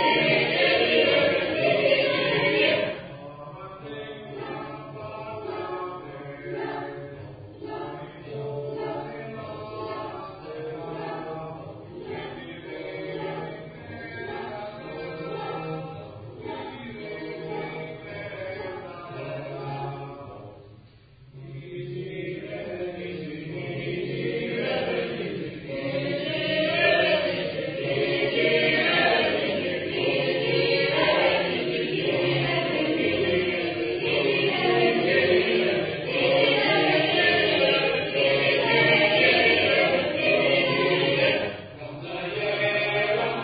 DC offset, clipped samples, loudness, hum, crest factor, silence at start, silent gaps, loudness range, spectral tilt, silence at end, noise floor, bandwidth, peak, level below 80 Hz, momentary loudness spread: under 0.1%; under 0.1%; -24 LUFS; none; 18 dB; 0 s; none; 16 LU; -9.5 dB/octave; 0 s; -51 dBFS; 5 kHz; -6 dBFS; -58 dBFS; 18 LU